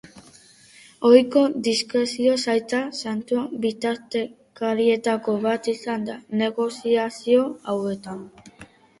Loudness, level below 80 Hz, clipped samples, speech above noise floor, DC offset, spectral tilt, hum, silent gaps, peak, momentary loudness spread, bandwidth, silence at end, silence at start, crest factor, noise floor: -22 LUFS; -66 dBFS; under 0.1%; 29 dB; under 0.1%; -4.5 dB/octave; none; none; -2 dBFS; 10 LU; 11.5 kHz; 0.35 s; 0.15 s; 22 dB; -51 dBFS